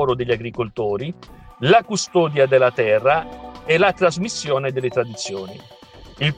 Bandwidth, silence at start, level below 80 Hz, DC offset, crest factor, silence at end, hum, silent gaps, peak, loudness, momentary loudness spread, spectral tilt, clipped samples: 9.8 kHz; 0 s; -50 dBFS; under 0.1%; 18 dB; 0.05 s; none; none; -2 dBFS; -19 LUFS; 15 LU; -5 dB/octave; under 0.1%